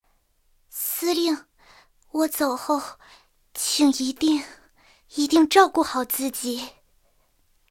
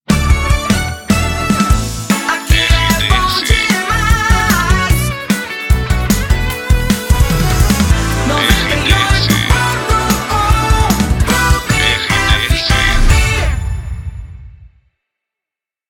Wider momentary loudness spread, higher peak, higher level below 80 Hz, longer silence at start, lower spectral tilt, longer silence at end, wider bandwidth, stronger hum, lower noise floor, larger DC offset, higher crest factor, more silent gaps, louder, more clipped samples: first, 17 LU vs 5 LU; second, -4 dBFS vs 0 dBFS; second, -62 dBFS vs -16 dBFS; first, 0.75 s vs 0.1 s; second, -1.5 dB/octave vs -4 dB/octave; second, 1 s vs 1.25 s; about the same, 17 kHz vs 18 kHz; neither; second, -65 dBFS vs -86 dBFS; neither; first, 22 dB vs 12 dB; neither; second, -23 LUFS vs -13 LUFS; neither